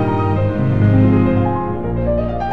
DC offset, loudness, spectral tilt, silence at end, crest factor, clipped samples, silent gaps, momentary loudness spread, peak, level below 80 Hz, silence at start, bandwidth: 3%; -16 LUFS; -10.5 dB/octave; 0 s; 12 dB; under 0.1%; none; 8 LU; -2 dBFS; -30 dBFS; 0 s; 4.6 kHz